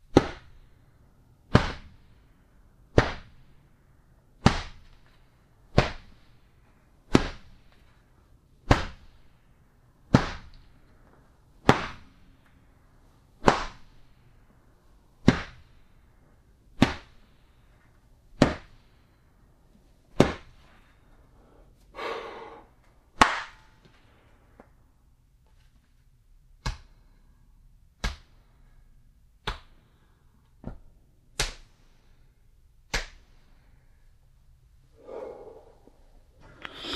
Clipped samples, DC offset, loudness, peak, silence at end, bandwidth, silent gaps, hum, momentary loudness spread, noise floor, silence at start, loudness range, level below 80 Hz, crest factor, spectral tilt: under 0.1%; under 0.1%; -28 LUFS; 0 dBFS; 0 s; 13 kHz; none; none; 22 LU; -60 dBFS; 0.15 s; 13 LU; -44 dBFS; 32 dB; -5.5 dB/octave